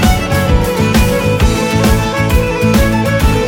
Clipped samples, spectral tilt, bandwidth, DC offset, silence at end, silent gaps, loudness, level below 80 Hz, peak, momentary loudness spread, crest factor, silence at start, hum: under 0.1%; -5.5 dB/octave; 18.5 kHz; under 0.1%; 0 s; none; -12 LUFS; -16 dBFS; 0 dBFS; 2 LU; 10 dB; 0 s; none